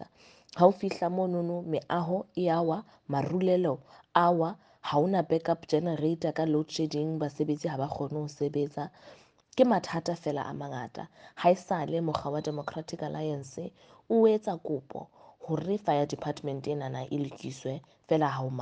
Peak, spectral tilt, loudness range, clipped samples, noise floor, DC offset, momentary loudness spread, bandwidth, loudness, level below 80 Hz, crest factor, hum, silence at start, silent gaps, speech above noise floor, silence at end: -8 dBFS; -7 dB/octave; 4 LU; under 0.1%; -58 dBFS; under 0.1%; 13 LU; 9.2 kHz; -30 LUFS; -68 dBFS; 22 dB; none; 0 s; none; 28 dB; 0 s